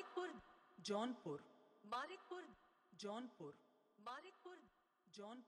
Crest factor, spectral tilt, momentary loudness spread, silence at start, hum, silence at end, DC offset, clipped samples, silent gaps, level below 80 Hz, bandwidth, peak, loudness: 20 dB; -4.5 dB/octave; 18 LU; 0 s; none; 0 s; under 0.1%; under 0.1%; none; -88 dBFS; 11.5 kHz; -32 dBFS; -52 LUFS